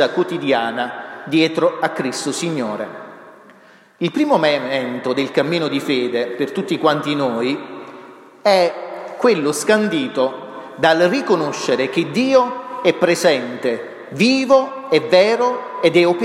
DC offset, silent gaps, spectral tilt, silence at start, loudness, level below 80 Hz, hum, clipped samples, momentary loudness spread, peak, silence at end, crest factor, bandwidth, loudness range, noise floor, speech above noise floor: under 0.1%; none; -4.5 dB/octave; 0 s; -18 LUFS; -68 dBFS; none; under 0.1%; 12 LU; -2 dBFS; 0 s; 16 dB; 14 kHz; 4 LU; -47 dBFS; 31 dB